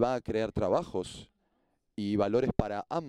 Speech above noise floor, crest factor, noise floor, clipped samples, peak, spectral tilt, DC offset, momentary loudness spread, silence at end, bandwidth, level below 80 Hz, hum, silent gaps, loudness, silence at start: 45 dB; 22 dB; -75 dBFS; under 0.1%; -8 dBFS; -7 dB/octave; under 0.1%; 14 LU; 0 s; 11.5 kHz; -50 dBFS; none; none; -31 LUFS; 0 s